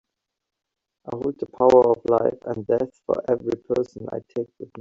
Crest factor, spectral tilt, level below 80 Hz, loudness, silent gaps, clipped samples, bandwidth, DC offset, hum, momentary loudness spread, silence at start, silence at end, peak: 20 dB; -8 dB/octave; -58 dBFS; -22 LUFS; none; under 0.1%; 7.6 kHz; under 0.1%; none; 15 LU; 1.05 s; 0 s; -4 dBFS